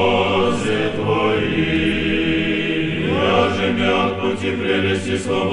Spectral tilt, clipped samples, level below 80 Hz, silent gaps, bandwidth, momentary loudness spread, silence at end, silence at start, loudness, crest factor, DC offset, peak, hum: -5.5 dB/octave; under 0.1%; -40 dBFS; none; 11 kHz; 4 LU; 0 s; 0 s; -18 LUFS; 14 dB; under 0.1%; -4 dBFS; none